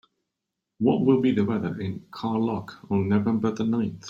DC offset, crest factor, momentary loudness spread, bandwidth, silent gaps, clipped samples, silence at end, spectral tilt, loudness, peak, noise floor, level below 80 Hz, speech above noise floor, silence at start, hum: under 0.1%; 18 dB; 12 LU; 7.4 kHz; none; under 0.1%; 0 s; -8 dB/octave; -25 LUFS; -8 dBFS; -84 dBFS; -62 dBFS; 60 dB; 0.8 s; none